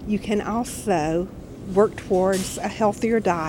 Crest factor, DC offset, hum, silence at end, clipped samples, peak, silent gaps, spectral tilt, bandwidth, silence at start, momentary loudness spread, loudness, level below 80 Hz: 18 dB; under 0.1%; none; 0 s; under 0.1%; -4 dBFS; none; -5.5 dB/octave; 17.5 kHz; 0 s; 6 LU; -23 LUFS; -44 dBFS